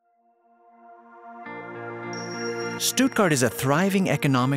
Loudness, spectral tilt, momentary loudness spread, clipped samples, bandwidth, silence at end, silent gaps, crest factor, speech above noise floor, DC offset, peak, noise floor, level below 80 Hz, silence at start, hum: -23 LUFS; -4.5 dB/octave; 17 LU; under 0.1%; 16 kHz; 0 s; none; 18 dB; 42 dB; under 0.1%; -6 dBFS; -64 dBFS; -64 dBFS; 0.9 s; none